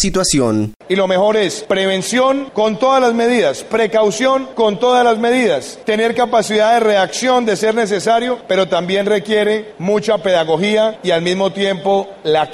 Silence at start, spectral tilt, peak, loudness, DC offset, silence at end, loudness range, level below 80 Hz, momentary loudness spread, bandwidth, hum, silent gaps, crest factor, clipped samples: 0 s; -4 dB/octave; -4 dBFS; -15 LUFS; under 0.1%; 0 s; 2 LU; -44 dBFS; 5 LU; 13.5 kHz; none; 0.76-0.80 s; 10 dB; under 0.1%